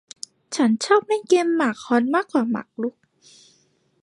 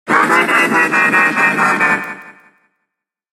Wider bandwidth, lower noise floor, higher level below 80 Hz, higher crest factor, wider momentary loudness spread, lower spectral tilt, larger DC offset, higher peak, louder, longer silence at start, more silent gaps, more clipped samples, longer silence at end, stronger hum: second, 11.5 kHz vs 16 kHz; second, -63 dBFS vs -77 dBFS; second, -76 dBFS vs -68 dBFS; first, 20 dB vs 14 dB; first, 12 LU vs 7 LU; about the same, -4 dB/octave vs -3.5 dB/octave; neither; second, -4 dBFS vs 0 dBFS; second, -21 LUFS vs -12 LUFS; first, 0.5 s vs 0.05 s; neither; neither; about the same, 1.1 s vs 1 s; neither